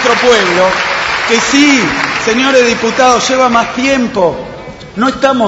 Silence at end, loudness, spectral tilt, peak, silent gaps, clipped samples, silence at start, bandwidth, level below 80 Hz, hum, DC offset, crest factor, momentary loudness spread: 0 s; -9 LUFS; -3 dB/octave; 0 dBFS; none; 0.2%; 0 s; 8.4 kHz; -40 dBFS; none; under 0.1%; 10 dB; 7 LU